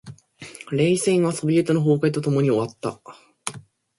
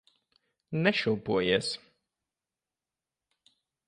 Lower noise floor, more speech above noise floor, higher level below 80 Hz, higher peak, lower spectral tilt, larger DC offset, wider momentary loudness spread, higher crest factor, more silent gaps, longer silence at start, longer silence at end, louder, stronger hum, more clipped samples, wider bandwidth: second, -43 dBFS vs under -90 dBFS; second, 22 dB vs over 62 dB; about the same, -62 dBFS vs -66 dBFS; first, -6 dBFS vs -10 dBFS; about the same, -6 dB/octave vs -5 dB/octave; neither; first, 14 LU vs 10 LU; second, 16 dB vs 24 dB; neither; second, 0.05 s vs 0.7 s; second, 0.4 s vs 2.1 s; first, -21 LUFS vs -28 LUFS; neither; neither; about the same, 11.5 kHz vs 11 kHz